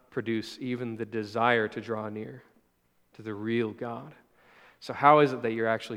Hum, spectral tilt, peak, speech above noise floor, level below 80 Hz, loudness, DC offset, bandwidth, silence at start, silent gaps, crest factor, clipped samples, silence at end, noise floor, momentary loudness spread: none; -6.5 dB/octave; -4 dBFS; 42 dB; -76 dBFS; -28 LUFS; under 0.1%; 13.5 kHz; 0.15 s; none; 24 dB; under 0.1%; 0 s; -70 dBFS; 19 LU